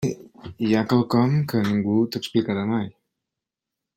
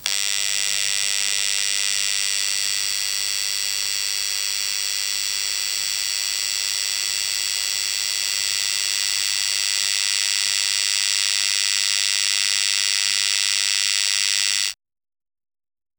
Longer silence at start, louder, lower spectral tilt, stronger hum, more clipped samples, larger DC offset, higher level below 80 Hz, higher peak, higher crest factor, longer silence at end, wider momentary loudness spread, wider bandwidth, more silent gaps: about the same, 0 s vs 0 s; second, -22 LUFS vs -19 LUFS; first, -7 dB/octave vs 4 dB/octave; neither; neither; neither; first, -60 dBFS vs -66 dBFS; second, -6 dBFS vs 0 dBFS; second, 16 dB vs 22 dB; second, 1.05 s vs 1.25 s; first, 10 LU vs 3 LU; second, 16 kHz vs over 20 kHz; neither